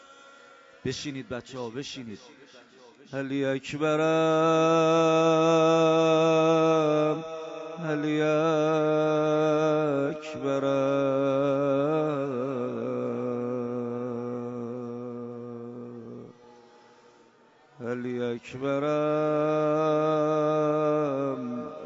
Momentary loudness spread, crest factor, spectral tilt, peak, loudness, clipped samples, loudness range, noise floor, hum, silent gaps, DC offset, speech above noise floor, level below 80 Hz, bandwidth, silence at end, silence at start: 16 LU; 14 dB; -6 dB/octave; -12 dBFS; -26 LUFS; under 0.1%; 15 LU; -59 dBFS; none; none; under 0.1%; 34 dB; -70 dBFS; 7.8 kHz; 0 s; 0.1 s